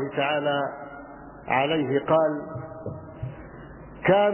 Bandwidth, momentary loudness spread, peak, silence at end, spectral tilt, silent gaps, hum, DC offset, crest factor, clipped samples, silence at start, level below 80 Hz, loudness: 3.2 kHz; 20 LU; -6 dBFS; 0 s; -9.5 dB/octave; none; none; under 0.1%; 20 dB; under 0.1%; 0 s; -52 dBFS; -25 LUFS